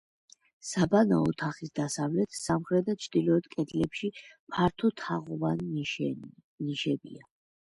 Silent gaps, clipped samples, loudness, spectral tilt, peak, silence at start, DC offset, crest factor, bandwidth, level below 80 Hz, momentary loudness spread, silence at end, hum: 4.39-4.47 s, 6.44-6.58 s; under 0.1%; -30 LUFS; -6 dB/octave; -12 dBFS; 0.65 s; under 0.1%; 18 dB; 11.5 kHz; -60 dBFS; 11 LU; 0.55 s; none